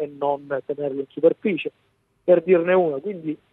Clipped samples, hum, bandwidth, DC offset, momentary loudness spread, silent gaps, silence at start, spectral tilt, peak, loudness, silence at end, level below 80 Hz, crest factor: under 0.1%; none; 4 kHz; under 0.1%; 12 LU; none; 0 s; -9.5 dB/octave; -4 dBFS; -22 LUFS; 0.15 s; -70 dBFS; 18 dB